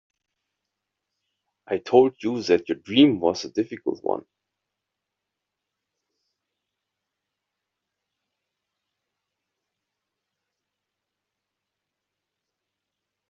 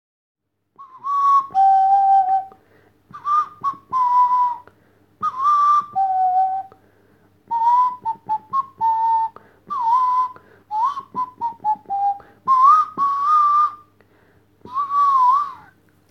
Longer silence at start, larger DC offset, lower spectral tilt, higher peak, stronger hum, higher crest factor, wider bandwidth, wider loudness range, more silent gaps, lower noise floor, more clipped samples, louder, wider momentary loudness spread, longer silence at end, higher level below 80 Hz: first, 1.7 s vs 0.8 s; neither; about the same, -4 dB/octave vs -4 dB/octave; about the same, -4 dBFS vs -4 dBFS; neither; first, 26 dB vs 16 dB; about the same, 7.2 kHz vs 6.6 kHz; first, 13 LU vs 4 LU; neither; first, -84 dBFS vs -56 dBFS; neither; second, -22 LUFS vs -18 LUFS; about the same, 12 LU vs 13 LU; first, 9.1 s vs 0.55 s; about the same, -72 dBFS vs -68 dBFS